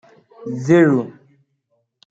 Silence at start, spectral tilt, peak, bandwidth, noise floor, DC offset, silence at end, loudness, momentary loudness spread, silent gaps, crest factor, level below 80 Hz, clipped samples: 0.4 s; -8 dB/octave; -2 dBFS; 7.8 kHz; -69 dBFS; under 0.1%; 1 s; -16 LUFS; 20 LU; none; 18 dB; -62 dBFS; under 0.1%